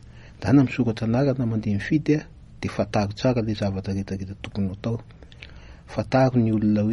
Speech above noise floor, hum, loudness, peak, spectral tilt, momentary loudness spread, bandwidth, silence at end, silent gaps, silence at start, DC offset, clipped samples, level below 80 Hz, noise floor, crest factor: 21 dB; none; -24 LUFS; -6 dBFS; -8 dB/octave; 13 LU; 11.5 kHz; 0 s; none; 0.05 s; under 0.1%; under 0.1%; -46 dBFS; -43 dBFS; 18 dB